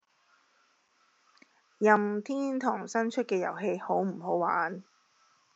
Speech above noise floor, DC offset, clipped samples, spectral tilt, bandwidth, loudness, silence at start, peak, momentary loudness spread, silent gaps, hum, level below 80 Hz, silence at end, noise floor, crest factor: 40 dB; under 0.1%; under 0.1%; -5 dB/octave; 8 kHz; -30 LUFS; 1.8 s; -8 dBFS; 7 LU; none; none; under -90 dBFS; 0.75 s; -69 dBFS; 24 dB